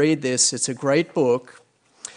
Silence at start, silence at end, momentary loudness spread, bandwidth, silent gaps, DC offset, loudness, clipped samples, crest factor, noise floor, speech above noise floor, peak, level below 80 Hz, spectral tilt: 0 s; 0.05 s; 6 LU; 10.5 kHz; none; under 0.1%; -20 LUFS; under 0.1%; 16 dB; -43 dBFS; 22 dB; -6 dBFS; -68 dBFS; -3.5 dB/octave